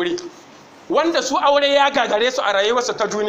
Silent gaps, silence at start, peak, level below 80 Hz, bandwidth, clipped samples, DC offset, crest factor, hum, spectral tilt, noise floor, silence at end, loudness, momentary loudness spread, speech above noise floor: none; 0 s; -2 dBFS; -58 dBFS; 16 kHz; under 0.1%; under 0.1%; 16 dB; none; -2 dB/octave; -44 dBFS; 0 s; -17 LUFS; 8 LU; 26 dB